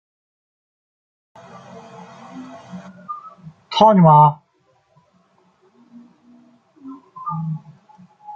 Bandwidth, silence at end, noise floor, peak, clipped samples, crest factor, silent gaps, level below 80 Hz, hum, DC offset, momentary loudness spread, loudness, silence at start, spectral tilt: 7.2 kHz; 0 s; -62 dBFS; -2 dBFS; under 0.1%; 20 dB; none; -62 dBFS; none; under 0.1%; 29 LU; -14 LUFS; 2.35 s; -8 dB/octave